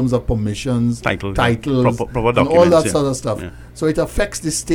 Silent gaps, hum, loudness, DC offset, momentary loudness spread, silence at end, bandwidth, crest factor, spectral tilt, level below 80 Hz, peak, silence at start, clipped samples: none; none; -17 LUFS; under 0.1%; 9 LU; 0 s; 16.5 kHz; 14 dB; -5.5 dB/octave; -32 dBFS; -2 dBFS; 0 s; under 0.1%